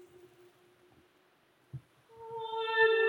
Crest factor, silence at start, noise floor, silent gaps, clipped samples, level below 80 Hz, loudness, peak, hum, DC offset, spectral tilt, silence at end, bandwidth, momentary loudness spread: 20 dB; 1.75 s; -68 dBFS; none; under 0.1%; -78 dBFS; -32 LUFS; -16 dBFS; none; under 0.1%; -4.5 dB/octave; 0 s; 9.8 kHz; 24 LU